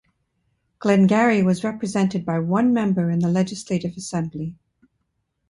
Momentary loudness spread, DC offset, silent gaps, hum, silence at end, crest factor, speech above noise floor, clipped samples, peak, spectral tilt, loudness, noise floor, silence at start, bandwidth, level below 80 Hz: 11 LU; under 0.1%; none; none; 0.95 s; 16 dB; 53 dB; under 0.1%; -4 dBFS; -7 dB/octave; -21 LUFS; -73 dBFS; 0.8 s; 11 kHz; -60 dBFS